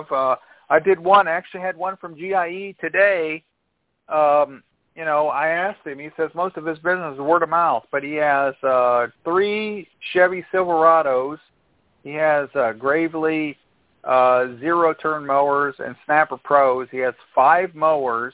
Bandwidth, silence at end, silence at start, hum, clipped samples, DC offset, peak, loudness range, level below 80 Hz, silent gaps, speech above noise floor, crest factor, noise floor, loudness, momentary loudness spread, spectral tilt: 4 kHz; 0.05 s; 0 s; none; under 0.1%; under 0.1%; -2 dBFS; 3 LU; -64 dBFS; none; 53 dB; 18 dB; -72 dBFS; -20 LUFS; 11 LU; -8.5 dB/octave